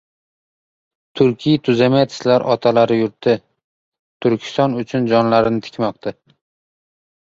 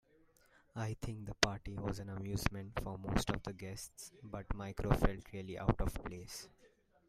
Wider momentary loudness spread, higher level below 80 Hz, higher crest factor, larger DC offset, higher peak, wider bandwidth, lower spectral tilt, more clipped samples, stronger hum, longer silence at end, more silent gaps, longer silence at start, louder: second, 8 LU vs 14 LU; second, -56 dBFS vs -46 dBFS; second, 16 dB vs 28 dB; neither; first, -2 dBFS vs -12 dBFS; second, 7.8 kHz vs 15.5 kHz; first, -7 dB/octave vs -5 dB/octave; neither; neither; first, 1.25 s vs 0.4 s; first, 3.64-3.92 s, 3.99-4.20 s vs none; first, 1.15 s vs 0.75 s; first, -17 LUFS vs -40 LUFS